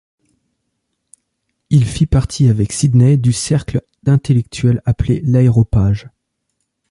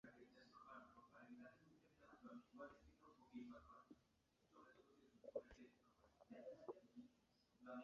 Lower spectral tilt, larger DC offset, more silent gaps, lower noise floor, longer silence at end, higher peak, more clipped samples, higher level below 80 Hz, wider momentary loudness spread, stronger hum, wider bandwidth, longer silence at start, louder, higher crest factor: first, -7 dB/octave vs -5 dB/octave; neither; neither; second, -71 dBFS vs -83 dBFS; first, 0.85 s vs 0 s; first, -2 dBFS vs -38 dBFS; neither; first, -32 dBFS vs -84 dBFS; second, 6 LU vs 11 LU; neither; first, 11.5 kHz vs 7 kHz; first, 1.7 s vs 0.05 s; first, -14 LUFS vs -62 LUFS; second, 12 dB vs 26 dB